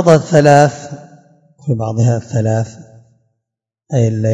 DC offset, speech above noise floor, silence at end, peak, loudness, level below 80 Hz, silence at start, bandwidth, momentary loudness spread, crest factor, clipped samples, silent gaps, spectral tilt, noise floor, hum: under 0.1%; 68 dB; 0 s; 0 dBFS; -13 LUFS; -52 dBFS; 0 s; 9.8 kHz; 19 LU; 14 dB; 0.6%; none; -7 dB/octave; -80 dBFS; none